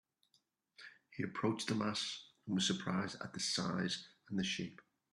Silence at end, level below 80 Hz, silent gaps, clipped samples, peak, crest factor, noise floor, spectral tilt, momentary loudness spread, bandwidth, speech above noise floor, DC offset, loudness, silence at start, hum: 0.3 s; -76 dBFS; none; under 0.1%; -20 dBFS; 20 dB; -79 dBFS; -4 dB/octave; 13 LU; 12 kHz; 40 dB; under 0.1%; -39 LUFS; 0.8 s; none